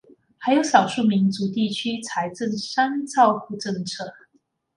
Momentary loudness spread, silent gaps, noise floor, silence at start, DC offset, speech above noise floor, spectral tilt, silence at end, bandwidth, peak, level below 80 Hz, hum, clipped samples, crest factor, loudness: 11 LU; none; -66 dBFS; 0.4 s; under 0.1%; 45 dB; -5 dB/octave; 0.65 s; 11.5 kHz; -2 dBFS; -68 dBFS; none; under 0.1%; 22 dB; -22 LUFS